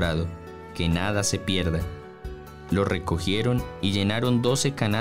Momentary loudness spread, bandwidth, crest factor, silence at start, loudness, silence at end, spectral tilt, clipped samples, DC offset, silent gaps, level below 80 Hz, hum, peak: 17 LU; 16 kHz; 14 dB; 0 s; -25 LUFS; 0 s; -5 dB/octave; under 0.1%; 0.5%; none; -40 dBFS; none; -12 dBFS